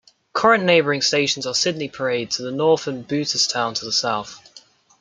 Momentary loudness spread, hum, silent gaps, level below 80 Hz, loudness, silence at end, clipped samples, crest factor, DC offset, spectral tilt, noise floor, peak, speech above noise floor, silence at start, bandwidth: 9 LU; none; none; -64 dBFS; -20 LUFS; 0.4 s; under 0.1%; 20 dB; under 0.1%; -3 dB/octave; -50 dBFS; -2 dBFS; 29 dB; 0.35 s; 9.6 kHz